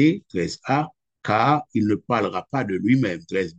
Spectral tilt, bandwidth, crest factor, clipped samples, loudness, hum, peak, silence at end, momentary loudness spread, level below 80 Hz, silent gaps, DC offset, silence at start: -7 dB/octave; 8.4 kHz; 18 dB; under 0.1%; -23 LUFS; none; -4 dBFS; 0.05 s; 7 LU; -60 dBFS; none; under 0.1%; 0 s